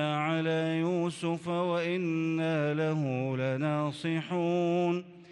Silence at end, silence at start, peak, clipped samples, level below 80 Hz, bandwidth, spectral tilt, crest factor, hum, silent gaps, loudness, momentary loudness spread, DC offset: 0 s; 0 s; -18 dBFS; under 0.1%; -76 dBFS; 11 kHz; -7 dB/octave; 12 dB; none; none; -30 LUFS; 3 LU; under 0.1%